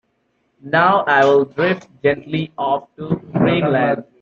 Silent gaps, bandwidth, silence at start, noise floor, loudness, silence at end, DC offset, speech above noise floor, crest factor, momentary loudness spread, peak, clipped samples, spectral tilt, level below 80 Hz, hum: none; 7.4 kHz; 0.65 s; -66 dBFS; -17 LUFS; 0.2 s; under 0.1%; 49 dB; 16 dB; 10 LU; -2 dBFS; under 0.1%; -7.5 dB/octave; -56 dBFS; none